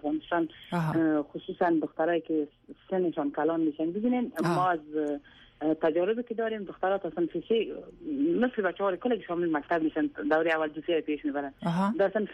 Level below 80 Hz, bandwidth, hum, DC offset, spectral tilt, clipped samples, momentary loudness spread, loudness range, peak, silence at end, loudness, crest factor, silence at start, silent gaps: -66 dBFS; 12.5 kHz; none; under 0.1%; -7.5 dB/octave; under 0.1%; 6 LU; 1 LU; -16 dBFS; 0 s; -29 LUFS; 14 dB; 0.05 s; none